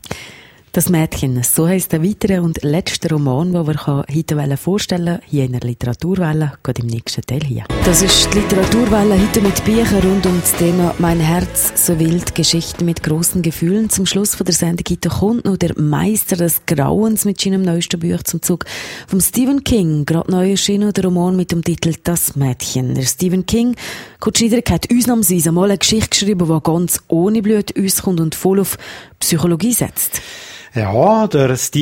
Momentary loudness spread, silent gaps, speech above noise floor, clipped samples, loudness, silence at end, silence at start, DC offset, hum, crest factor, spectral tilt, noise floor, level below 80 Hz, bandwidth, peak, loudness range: 7 LU; none; 25 dB; under 0.1%; -15 LUFS; 0 s; 0.05 s; under 0.1%; none; 16 dB; -4.5 dB/octave; -40 dBFS; -34 dBFS; 16.5 kHz; 0 dBFS; 4 LU